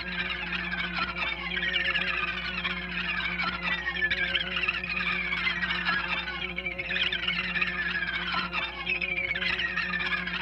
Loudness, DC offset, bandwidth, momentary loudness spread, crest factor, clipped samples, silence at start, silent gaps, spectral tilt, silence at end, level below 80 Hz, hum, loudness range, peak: -28 LUFS; under 0.1%; 8.4 kHz; 4 LU; 18 dB; under 0.1%; 0 s; none; -4.5 dB/octave; 0 s; -48 dBFS; none; 1 LU; -12 dBFS